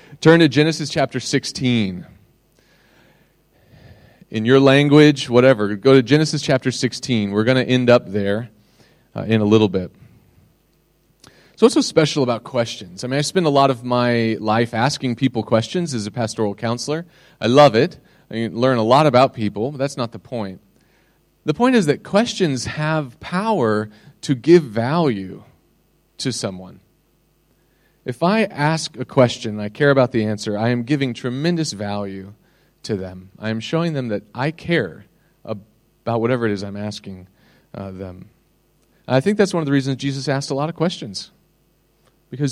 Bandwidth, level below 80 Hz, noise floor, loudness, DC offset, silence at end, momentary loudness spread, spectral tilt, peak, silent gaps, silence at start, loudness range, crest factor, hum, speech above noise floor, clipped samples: 12.5 kHz; -58 dBFS; -61 dBFS; -18 LUFS; under 0.1%; 0 s; 17 LU; -6 dB/octave; 0 dBFS; none; 0.1 s; 9 LU; 18 dB; none; 43 dB; under 0.1%